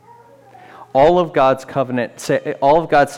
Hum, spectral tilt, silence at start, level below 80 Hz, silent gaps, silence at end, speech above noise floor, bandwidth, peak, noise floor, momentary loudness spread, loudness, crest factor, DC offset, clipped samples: none; -6 dB/octave; 0.8 s; -46 dBFS; none; 0 s; 30 dB; 15.5 kHz; -4 dBFS; -45 dBFS; 8 LU; -16 LUFS; 12 dB; under 0.1%; under 0.1%